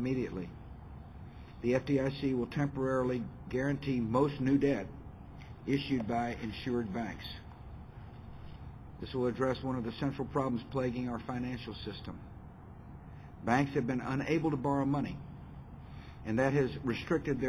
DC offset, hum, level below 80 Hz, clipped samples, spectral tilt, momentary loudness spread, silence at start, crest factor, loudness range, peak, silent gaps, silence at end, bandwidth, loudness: under 0.1%; none; -52 dBFS; under 0.1%; -7.5 dB/octave; 19 LU; 0 s; 18 dB; 6 LU; -16 dBFS; none; 0 s; 11.5 kHz; -34 LUFS